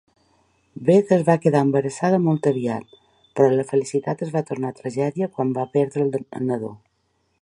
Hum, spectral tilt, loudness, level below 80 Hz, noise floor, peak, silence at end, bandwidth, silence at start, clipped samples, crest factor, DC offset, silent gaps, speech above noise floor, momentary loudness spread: none; -7.5 dB/octave; -21 LUFS; -66 dBFS; -69 dBFS; -2 dBFS; 0.65 s; 11 kHz; 0.75 s; under 0.1%; 20 dB; under 0.1%; none; 48 dB; 10 LU